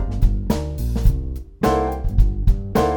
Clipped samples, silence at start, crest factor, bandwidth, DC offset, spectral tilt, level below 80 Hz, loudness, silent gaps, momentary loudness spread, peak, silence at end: under 0.1%; 0 s; 16 dB; 19 kHz; under 0.1%; -7.5 dB/octave; -20 dBFS; -22 LUFS; none; 5 LU; -2 dBFS; 0 s